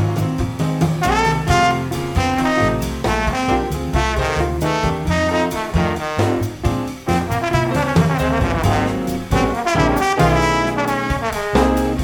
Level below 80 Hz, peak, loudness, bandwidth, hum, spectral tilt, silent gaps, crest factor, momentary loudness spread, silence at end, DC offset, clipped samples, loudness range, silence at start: -28 dBFS; -2 dBFS; -18 LUFS; 19.5 kHz; none; -6 dB/octave; none; 16 dB; 5 LU; 0 s; under 0.1%; under 0.1%; 2 LU; 0 s